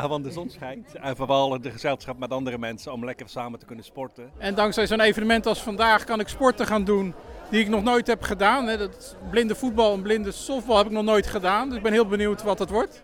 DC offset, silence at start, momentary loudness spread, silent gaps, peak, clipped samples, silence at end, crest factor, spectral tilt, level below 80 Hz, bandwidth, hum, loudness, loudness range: under 0.1%; 0 s; 15 LU; none; -4 dBFS; under 0.1%; 0.05 s; 20 dB; -4.5 dB/octave; -46 dBFS; 17.5 kHz; none; -24 LUFS; 6 LU